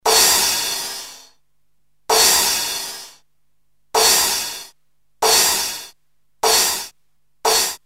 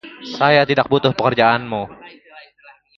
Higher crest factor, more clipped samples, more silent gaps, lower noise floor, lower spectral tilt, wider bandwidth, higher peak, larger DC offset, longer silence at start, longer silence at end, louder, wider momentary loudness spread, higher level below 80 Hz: about the same, 18 dB vs 18 dB; neither; neither; first, -72 dBFS vs -49 dBFS; second, 1 dB/octave vs -6.5 dB/octave; first, 16.5 kHz vs 7 kHz; about the same, -2 dBFS vs 0 dBFS; first, 0.2% vs under 0.1%; about the same, 0.05 s vs 0.05 s; second, 0.1 s vs 0.6 s; about the same, -15 LUFS vs -16 LUFS; first, 18 LU vs 14 LU; about the same, -52 dBFS vs -54 dBFS